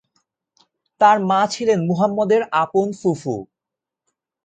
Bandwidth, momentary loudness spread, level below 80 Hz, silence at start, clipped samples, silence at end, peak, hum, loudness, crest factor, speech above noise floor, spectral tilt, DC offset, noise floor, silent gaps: 9.2 kHz; 9 LU; -64 dBFS; 1 s; under 0.1%; 1 s; -2 dBFS; none; -18 LUFS; 18 dB; 68 dB; -6 dB/octave; under 0.1%; -86 dBFS; none